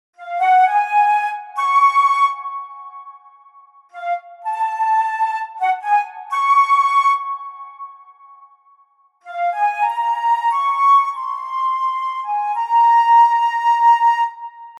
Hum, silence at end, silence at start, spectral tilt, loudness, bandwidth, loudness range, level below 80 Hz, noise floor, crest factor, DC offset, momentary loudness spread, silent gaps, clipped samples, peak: none; 0 s; 0.2 s; 3 dB/octave; -16 LUFS; 12 kHz; 7 LU; under -90 dBFS; -56 dBFS; 14 dB; under 0.1%; 17 LU; none; under 0.1%; -4 dBFS